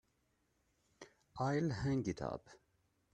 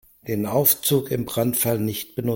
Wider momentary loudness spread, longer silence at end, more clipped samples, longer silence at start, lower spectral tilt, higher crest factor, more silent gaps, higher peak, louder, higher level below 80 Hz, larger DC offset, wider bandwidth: first, 24 LU vs 10 LU; first, 0.55 s vs 0 s; neither; first, 1 s vs 0.25 s; first, -7 dB/octave vs -4.5 dB/octave; about the same, 18 dB vs 20 dB; neither; second, -24 dBFS vs -4 dBFS; second, -39 LUFS vs -21 LUFS; second, -64 dBFS vs -56 dBFS; neither; second, 9.4 kHz vs 17 kHz